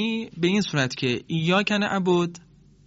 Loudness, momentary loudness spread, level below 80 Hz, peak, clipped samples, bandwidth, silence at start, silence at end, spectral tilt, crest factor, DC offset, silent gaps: -24 LUFS; 5 LU; -60 dBFS; -8 dBFS; under 0.1%; 8 kHz; 0 s; 0.5 s; -4 dB/octave; 16 dB; under 0.1%; none